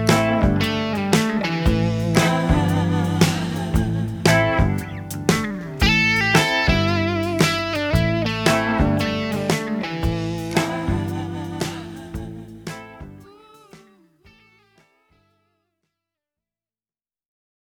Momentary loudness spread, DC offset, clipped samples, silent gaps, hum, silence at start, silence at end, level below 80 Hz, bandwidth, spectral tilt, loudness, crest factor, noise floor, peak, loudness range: 14 LU; under 0.1%; under 0.1%; none; none; 0 s; 3.85 s; -34 dBFS; 19.5 kHz; -5 dB/octave; -20 LUFS; 20 dB; under -90 dBFS; 0 dBFS; 14 LU